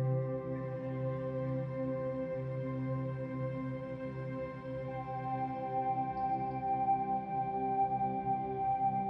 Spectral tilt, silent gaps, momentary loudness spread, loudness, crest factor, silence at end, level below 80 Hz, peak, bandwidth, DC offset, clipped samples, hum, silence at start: -10.5 dB/octave; none; 8 LU; -36 LUFS; 14 dB; 0 s; -62 dBFS; -22 dBFS; 5.4 kHz; under 0.1%; under 0.1%; none; 0 s